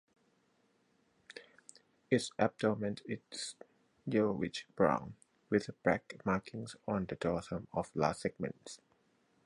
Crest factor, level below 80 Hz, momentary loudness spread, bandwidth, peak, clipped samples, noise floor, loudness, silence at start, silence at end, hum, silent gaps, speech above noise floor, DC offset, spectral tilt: 24 dB; -64 dBFS; 19 LU; 11.5 kHz; -14 dBFS; under 0.1%; -74 dBFS; -36 LUFS; 1.35 s; 0.7 s; none; none; 39 dB; under 0.1%; -5.5 dB/octave